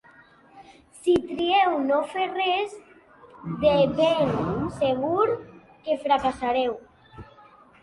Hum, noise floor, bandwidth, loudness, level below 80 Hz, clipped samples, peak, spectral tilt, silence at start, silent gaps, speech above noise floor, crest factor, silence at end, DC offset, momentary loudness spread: none; -54 dBFS; 11.5 kHz; -24 LUFS; -54 dBFS; under 0.1%; -8 dBFS; -6 dB/octave; 0.55 s; none; 30 dB; 18 dB; 0.6 s; under 0.1%; 11 LU